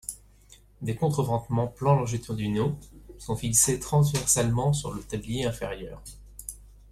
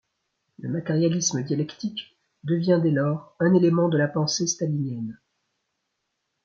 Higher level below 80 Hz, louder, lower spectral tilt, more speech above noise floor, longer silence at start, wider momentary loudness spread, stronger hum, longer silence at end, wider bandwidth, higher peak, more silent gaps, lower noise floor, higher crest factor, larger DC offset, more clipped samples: first, -48 dBFS vs -70 dBFS; about the same, -26 LUFS vs -24 LUFS; about the same, -5 dB/octave vs -5.5 dB/octave; second, 29 dB vs 55 dB; second, 0.1 s vs 0.6 s; first, 18 LU vs 13 LU; first, 50 Hz at -45 dBFS vs none; second, 0.2 s vs 1.3 s; first, 15 kHz vs 7.8 kHz; about the same, -8 dBFS vs -8 dBFS; neither; second, -55 dBFS vs -78 dBFS; about the same, 20 dB vs 18 dB; neither; neither